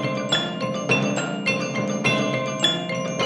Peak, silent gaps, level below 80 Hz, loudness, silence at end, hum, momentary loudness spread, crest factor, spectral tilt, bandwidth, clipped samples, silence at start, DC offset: -6 dBFS; none; -60 dBFS; -22 LUFS; 0 s; none; 4 LU; 18 dB; -4 dB/octave; 11.5 kHz; under 0.1%; 0 s; under 0.1%